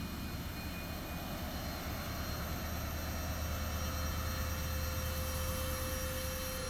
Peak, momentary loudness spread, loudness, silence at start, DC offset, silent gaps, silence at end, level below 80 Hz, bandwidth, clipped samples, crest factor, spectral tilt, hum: -26 dBFS; 5 LU; -39 LUFS; 0 s; under 0.1%; none; 0 s; -42 dBFS; over 20 kHz; under 0.1%; 12 dB; -4 dB/octave; none